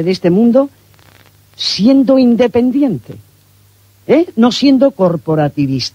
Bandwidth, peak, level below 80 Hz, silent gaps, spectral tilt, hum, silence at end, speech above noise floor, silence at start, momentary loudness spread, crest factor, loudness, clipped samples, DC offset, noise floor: 9.8 kHz; 0 dBFS; -50 dBFS; none; -6.5 dB/octave; none; 0.05 s; 37 dB; 0 s; 7 LU; 12 dB; -12 LUFS; under 0.1%; under 0.1%; -48 dBFS